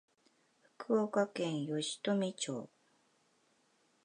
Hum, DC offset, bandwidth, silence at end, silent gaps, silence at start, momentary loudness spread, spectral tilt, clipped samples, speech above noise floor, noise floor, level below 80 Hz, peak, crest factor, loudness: none; under 0.1%; 11 kHz; 1.4 s; none; 0.8 s; 12 LU; -4.5 dB/octave; under 0.1%; 38 dB; -74 dBFS; under -90 dBFS; -20 dBFS; 20 dB; -36 LUFS